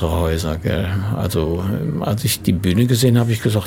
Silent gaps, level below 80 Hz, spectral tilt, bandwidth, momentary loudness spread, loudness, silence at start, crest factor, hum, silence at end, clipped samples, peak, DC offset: none; -34 dBFS; -6 dB/octave; 17 kHz; 6 LU; -18 LUFS; 0 s; 14 dB; none; 0 s; under 0.1%; -2 dBFS; under 0.1%